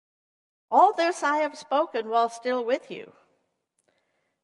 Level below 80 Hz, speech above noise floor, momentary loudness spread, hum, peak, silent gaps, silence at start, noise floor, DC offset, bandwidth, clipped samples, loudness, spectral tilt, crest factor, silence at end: -86 dBFS; 51 dB; 9 LU; none; -8 dBFS; none; 0.7 s; -75 dBFS; under 0.1%; 11.5 kHz; under 0.1%; -25 LUFS; -3 dB/octave; 20 dB; 1.4 s